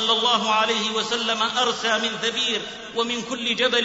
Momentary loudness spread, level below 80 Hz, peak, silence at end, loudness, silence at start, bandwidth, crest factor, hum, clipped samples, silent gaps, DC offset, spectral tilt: 6 LU; -62 dBFS; -6 dBFS; 0 s; -22 LUFS; 0 s; 8 kHz; 16 dB; none; under 0.1%; none; under 0.1%; -1.5 dB/octave